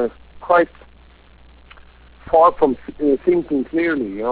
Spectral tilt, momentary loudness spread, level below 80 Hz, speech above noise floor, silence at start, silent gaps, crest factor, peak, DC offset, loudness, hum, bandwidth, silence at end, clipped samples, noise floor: -10 dB/octave; 9 LU; -46 dBFS; 30 dB; 0 s; none; 16 dB; -2 dBFS; under 0.1%; -18 LUFS; none; 4 kHz; 0 s; under 0.1%; -47 dBFS